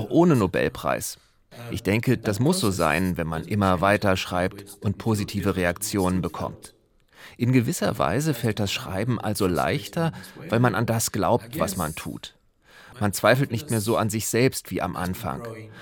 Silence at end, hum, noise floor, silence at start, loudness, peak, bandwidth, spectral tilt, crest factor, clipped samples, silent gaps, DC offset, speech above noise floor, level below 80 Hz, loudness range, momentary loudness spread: 0 s; none; -53 dBFS; 0 s; -24 LUFS; -4 dBFS; 18 kHz; -5.5 dB/octave; 20 dB; under 0.1%; none; under 0.1%; 29 dB; -52 dBFS; 3 LU; 11 LU